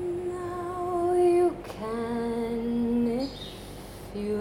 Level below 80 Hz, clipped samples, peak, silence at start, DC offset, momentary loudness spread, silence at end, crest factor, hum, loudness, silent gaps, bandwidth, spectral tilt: -50 dBFS; under 0.1%; -14 dBFS; 0 s; under 0.1%; 17 LU; 0 s; 14 dB; none; -28 LUFS; none; 15.5 kHz; -6.5 dB/octave